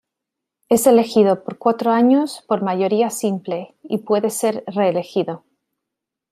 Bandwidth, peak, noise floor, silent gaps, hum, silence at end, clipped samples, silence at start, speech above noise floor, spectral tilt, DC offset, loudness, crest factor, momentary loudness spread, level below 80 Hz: 16 kHz; -2 dBFS; -83 dBFS; none; none; 0.95 s; under 0.1%; 0.7 s; 65 dB; -5.5 dB/octave; under 0.1%; -18 LUFS; 18 dB; 13 LU; -66 dBFS